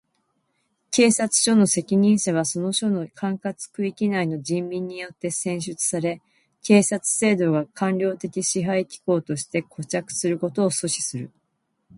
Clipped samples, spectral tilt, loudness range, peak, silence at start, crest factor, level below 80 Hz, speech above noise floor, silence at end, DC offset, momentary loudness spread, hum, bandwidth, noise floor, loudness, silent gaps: under 0.1%; -4.5 dB/octave; 5 LU; -4 dBFS; 0.9 s; 20 dB; -66 dBFS; 51 dB; 0.7 s; under 0.1%; 11 LU; none; 11.5 kHz; -74 dBFS; -22 LUFS; none